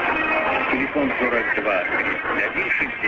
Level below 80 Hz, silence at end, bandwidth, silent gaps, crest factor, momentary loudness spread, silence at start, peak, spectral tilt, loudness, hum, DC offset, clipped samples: -50 dBFS; 0 s; 7.4 kHz; none; 14 dB; 2 LU; 0 s; -8 dBFS; -6 dB/octave; -20 LUFS; none; under 0.1%; under 0.1%